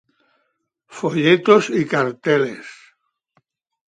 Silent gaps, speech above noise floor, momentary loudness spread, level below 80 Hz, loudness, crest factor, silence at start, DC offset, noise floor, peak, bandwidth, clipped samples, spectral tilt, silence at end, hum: none; 54 dB; 14 LU; -68 dBFS; -17 LUFS; 20 dB; 0.9 s; under 0.1%; -71 dBFS; -2 dBFS; 9.2 kHz; under 0.1%; -5.5 dB/octave; 1.15 s; none